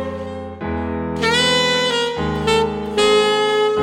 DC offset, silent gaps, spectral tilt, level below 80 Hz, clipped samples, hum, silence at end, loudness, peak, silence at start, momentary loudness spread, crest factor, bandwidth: under 0.1%; none; -3.5 dB/octave; -38 dBFS; under 0.1%; none; 0 s; -17 LUFS; -4 dBFS; 0 s; 12 LU; 14 dB; 16.5 kHz